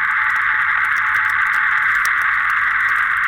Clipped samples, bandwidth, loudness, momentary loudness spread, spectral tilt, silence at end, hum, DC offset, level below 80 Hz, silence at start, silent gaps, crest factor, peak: under 0.1%; 17.5 kHz; -15 LUFS; 1 LU; -0.5 dB/octave; 0 s; none; under 0.1%; -52 dBFS; 0 s; none; 12 dB; -6 dBFS